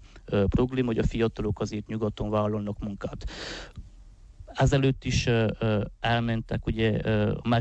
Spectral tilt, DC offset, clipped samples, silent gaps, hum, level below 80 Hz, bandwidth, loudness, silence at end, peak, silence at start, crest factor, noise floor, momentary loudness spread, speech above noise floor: -6.5 dB/octave; under 0.1%; under 0.1%; none; none; -40 dBFS; 8.4 kHz; -27 LUFS; 0 s; -12 dBFS; 0 s; 14 dB; -49 dBFS; 12 LU; 23 dB